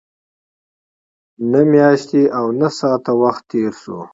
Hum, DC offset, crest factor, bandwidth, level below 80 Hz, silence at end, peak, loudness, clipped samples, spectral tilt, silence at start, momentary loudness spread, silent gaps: none; under 0.1%; 16 dB; 7.8 kHz; -62 dBFS; 0.1 s; 0 dBFS; -15 LUFS; under 0.1%; -7 dB/octave; 1.4 s; 10 LU; none